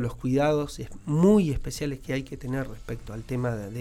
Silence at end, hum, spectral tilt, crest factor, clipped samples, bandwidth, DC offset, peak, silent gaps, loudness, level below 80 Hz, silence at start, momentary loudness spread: 0 s; none; -7 dB/octave; 18 dB; under 0.1%; 16 kHz; under 0.1%; -8 dBFS; none; -27 LUFS; -42 dBFS; 0 s; 16 LU